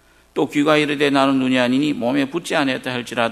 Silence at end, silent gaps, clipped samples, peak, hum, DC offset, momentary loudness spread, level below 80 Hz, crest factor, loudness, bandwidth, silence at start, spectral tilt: 0 s; none; under 0.1%; 0 dBFS; none; under 0.1%; 8 LU; -58 dBFS; 18 dB; -18 LUFS; 13.5 kHz; 0.35 s; -5 dB/octave